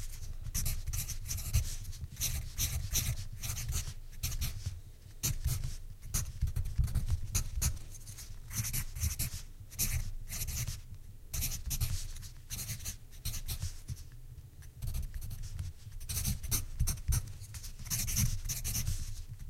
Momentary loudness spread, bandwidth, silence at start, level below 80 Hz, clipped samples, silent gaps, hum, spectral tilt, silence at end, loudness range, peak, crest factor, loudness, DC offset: 13 LU; 16.5 kHz; 0 s; -40 dBFS; under 0.1%; none; none; -3 dB/octave; 0 s; 6 LU; -16 dBFS; 20 dB; -38 LUFS; under 0.1%